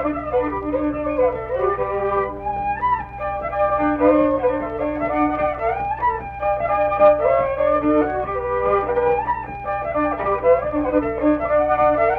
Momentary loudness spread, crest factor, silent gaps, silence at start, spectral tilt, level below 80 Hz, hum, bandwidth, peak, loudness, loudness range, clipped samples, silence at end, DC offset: 7 LU; 16 dB; none; 0 s; -9.5 dB/octave; -40 dBFS; none; 4.6 kHz; -4 dBFS; -20 LUFS; 3 LU; under 0.1%; 0 s; under 0.1%